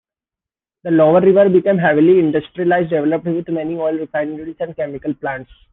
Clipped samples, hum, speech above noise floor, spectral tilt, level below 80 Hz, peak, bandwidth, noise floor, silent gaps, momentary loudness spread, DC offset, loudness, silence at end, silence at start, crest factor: under 0.1%; none; 73 dB; -11 dB/octave; -54 dBFS; -2 dBFS; 3.9 kHz; -88 dBFS; none; 14 LU; under 0.1%; -16 LUFS; 0.3 s; 0.85 s; 14 dB